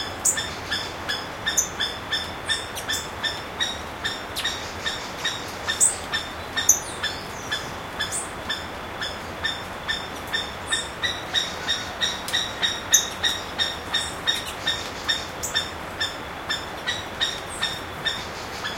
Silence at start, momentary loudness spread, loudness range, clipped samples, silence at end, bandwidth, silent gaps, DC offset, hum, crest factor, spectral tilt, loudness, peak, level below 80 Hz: 0 s; 9 LU; 5 LU; under 0.1%; 0 s; 16.5 kHz; none; under 0.1%; none; 26 dB; -0.5 dB/octave; -25 LUFS; 0 dBFS; -48 dBFS